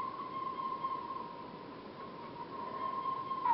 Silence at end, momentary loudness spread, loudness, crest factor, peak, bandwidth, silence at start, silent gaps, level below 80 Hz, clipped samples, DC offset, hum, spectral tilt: 0 s; 10 LU; -41 LUFS; 18 dB; -22 dBFS; 5.8 kHz; 0 s; none; -74 dBFS; under 0.1%; under 0.1%; none; -3.5 dB/octave